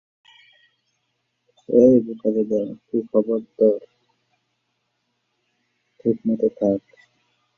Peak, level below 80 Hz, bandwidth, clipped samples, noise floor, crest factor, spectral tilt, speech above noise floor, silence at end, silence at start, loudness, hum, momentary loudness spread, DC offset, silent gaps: -2 dBFS; -64 dBFS; 6.6 kHz; under 0.1%; -73 dBFS; 20 dB; -10 dB/octave; 54 dB; 0.8 s; 1.7 s; -21 LUFS; none; 11 LU; under 0.1%; none